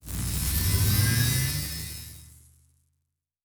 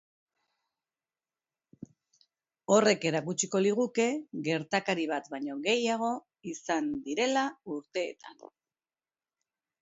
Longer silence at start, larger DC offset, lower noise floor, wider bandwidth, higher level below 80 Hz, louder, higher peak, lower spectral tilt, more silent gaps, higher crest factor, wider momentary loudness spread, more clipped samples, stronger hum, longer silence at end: second, 0.05 s vs 2.7 s; neither; second, -80 dBFS vs under -90 dBFS; first, over 20 kHz vs 8 kHz; first, -36 dBFS vs -76 dBFS; first, -25 LUFS vs -30 LUFS; about the same, -10 dBFS vs -10 dBFS; about the same, -3.5 dB/octave vs -4 dB/octave; neither; about the same, 18 dB vs 22 dB; about the same, 15 LU vs 13 LU; neither; neither; second, 1.2 s vs 1.35 s